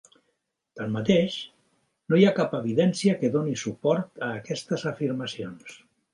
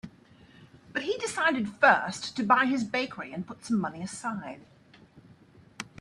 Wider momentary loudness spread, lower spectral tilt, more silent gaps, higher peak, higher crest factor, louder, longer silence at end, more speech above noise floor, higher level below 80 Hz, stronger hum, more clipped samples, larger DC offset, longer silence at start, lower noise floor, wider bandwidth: second, 15 LU vs 20 LU; first, -6 dB/octave vs -4 dB/octave; neither; about the same, -6 dBFS vs -8 dBFS; about the same, 20 dB vs 22 dB; about the same, -26 LUFS vs -28 LUFS; first, 0.35 s vs 0 s; first, 52 dB vs 28 dB; about the same, -66 dBFS vs -68 dBFS; neither; neither; neither; first, 0.75 s vs 0.05 s; first, -77 dBFS vs -56 dBFS; about the same, 11 kHz vs 12 kHz